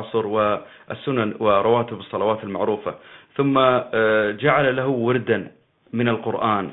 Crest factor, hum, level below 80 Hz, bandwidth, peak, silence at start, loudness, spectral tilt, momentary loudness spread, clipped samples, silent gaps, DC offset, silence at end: 20 dB; none; -60 dBFS; 4.1 kHz; -2 dBFS; 0 s; -21 LUFS; -11 dB/octave; 12 LU; under 0.1%; none; under 0.1%; 0 s